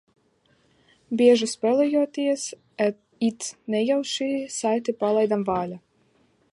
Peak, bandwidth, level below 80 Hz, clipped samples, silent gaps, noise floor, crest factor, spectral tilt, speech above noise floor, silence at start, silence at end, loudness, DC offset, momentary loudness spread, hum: -6 dBFS; 11.5 kHz; -66 dBFS; under 0.1%; none; -64 dBFS; 18 dB; -4.5 dB/octave; 41 dB; 1.1 s; 0.75 s; -24 LUFS; under 0.1%; 10 LU; none